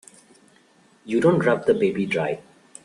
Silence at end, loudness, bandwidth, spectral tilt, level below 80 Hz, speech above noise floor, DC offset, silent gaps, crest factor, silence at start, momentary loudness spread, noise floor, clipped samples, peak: 0.45 s; -21 LUFS; 11.5 kHz; -7 dB/octave; -62 dBFS; 36 dB; under 0.1%; none; 18 dB; 1.05 s; 9 LU; -57 dBFS; under 0.1%; -6 dBFS